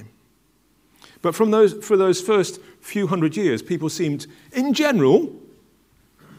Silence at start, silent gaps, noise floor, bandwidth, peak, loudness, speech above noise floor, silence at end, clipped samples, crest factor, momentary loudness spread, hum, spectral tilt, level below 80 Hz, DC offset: 0 s; none; -61 dBFS; 16 kHz; -2 dBFS; -20 LUFS; 42 dB; 1 s; under 0.1%; 18 dB; 13 LU; none; -5.5 dB/octave; -66 dBFS; under 0.1%